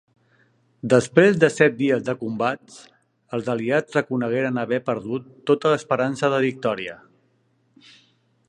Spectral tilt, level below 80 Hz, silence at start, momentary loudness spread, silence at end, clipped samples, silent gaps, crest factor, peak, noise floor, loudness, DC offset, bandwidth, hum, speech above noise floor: -6 dB/octave; -66 dBFS; 0.85 s; 12 LU; 1.55 s; under 0.1%; none; 22 dB; -2 dBFS; -65 dBFS; -21 LUFS; under 0.1%; 11 kHz; none; 44 dB